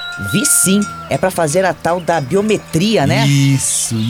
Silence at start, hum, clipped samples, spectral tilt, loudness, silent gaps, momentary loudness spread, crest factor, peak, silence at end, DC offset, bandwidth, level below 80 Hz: 0 s; none; under 0.1%; -4 dB/octave; -14 LUFS; none; 7 LU; 14 dB; 0 dBFS; 0 s; under 0.1%; 18 kHz; -46 dBFS